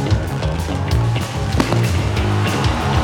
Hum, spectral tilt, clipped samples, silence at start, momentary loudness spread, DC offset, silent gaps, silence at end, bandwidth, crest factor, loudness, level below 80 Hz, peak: none; -6 dB/octave; under 0.1%; 0 s; 4 LU; under 0.1%; none; 0 s; 17 kHz; 16 dB; -19 LUFS; -26 dBFS; -2 dBFS